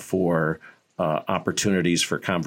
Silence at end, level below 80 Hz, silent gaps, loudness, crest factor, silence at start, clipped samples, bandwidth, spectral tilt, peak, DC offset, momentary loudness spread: 0 s; -60 dBFS; none; -24 LUFS; 18 dB; 0 s; under 0.1%; 16.5 kHz; -4.5 dB/octave; -6 dBFS; under 0.1%; 7 LU